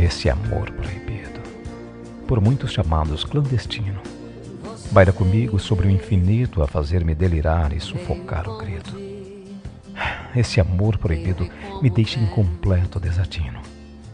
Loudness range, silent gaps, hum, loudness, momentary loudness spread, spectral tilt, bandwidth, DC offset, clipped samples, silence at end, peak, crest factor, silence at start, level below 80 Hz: 5 LU; none; none; -21 LUFS; 17 LU; -7 dB/octave; 10 kHz; under 0.1%; under 0.1%; 0 s; 0 dBFS; 20 dB; 0 s; -32 dBFS